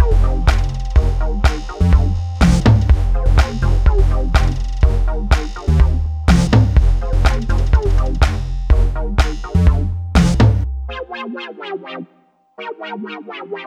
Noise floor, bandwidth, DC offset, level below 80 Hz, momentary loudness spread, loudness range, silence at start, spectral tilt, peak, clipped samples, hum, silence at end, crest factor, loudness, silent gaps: -55 dBFS; 10.5 kHz; under 0.1%; -16 dBFS; 15 LU; 3 LU; 0 s; -7 dB/octave; 0 dBFS; under 0.1%; none; 0 s; 14 dB; -17 LUFS; none